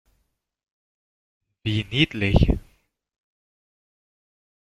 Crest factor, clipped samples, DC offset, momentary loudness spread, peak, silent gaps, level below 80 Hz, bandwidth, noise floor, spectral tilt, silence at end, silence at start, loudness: 24 dB; under 0.1%; under 0.1%; 9 LU; -2 dBFS; none; -34 dBFS; 11 kHz; -73 dBFS; -7 dB/octave; 2 s; 1.65 s; -23 LUFS